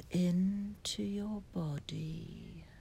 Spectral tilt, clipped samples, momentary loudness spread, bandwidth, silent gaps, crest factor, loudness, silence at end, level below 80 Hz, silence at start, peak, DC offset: -6 dB/octave; under 0.1%; 16 LU; 13 kHz; none; 14 dB; -37 LUFS; 0 s; -58 dBFS; 0 s; -24 dBFS; under 0.1%